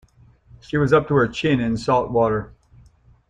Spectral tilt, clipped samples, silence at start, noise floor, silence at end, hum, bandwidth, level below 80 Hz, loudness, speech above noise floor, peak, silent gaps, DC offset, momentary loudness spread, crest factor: -7 dB/octave; under 0.1%; 0.75 s; -52 dBFS; 0.8 s; none; 9.4 kHz; -46 dBFS; -20 LUFS; 33 dB; -2 dBFS; none; under 0.1%; 10 LU; 18 dB